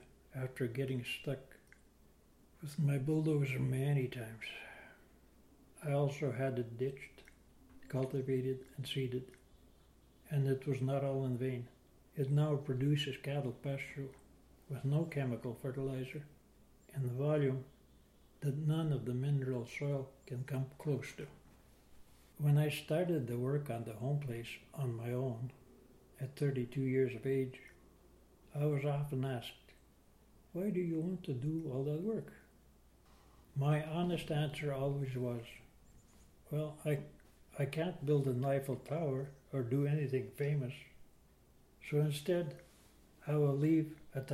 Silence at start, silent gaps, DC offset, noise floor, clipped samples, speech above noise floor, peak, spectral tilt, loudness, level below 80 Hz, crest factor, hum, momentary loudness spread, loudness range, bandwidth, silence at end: 0 s; none; under 0.1%; -66 dBFS; under 0.1%; 29 dB; -22 dBFS; -7.5 dB/octave; -38 LUFS; -66 dBFS; 16 dB; none; 14 LU; 4 LU; 14.5 kHz; 0 s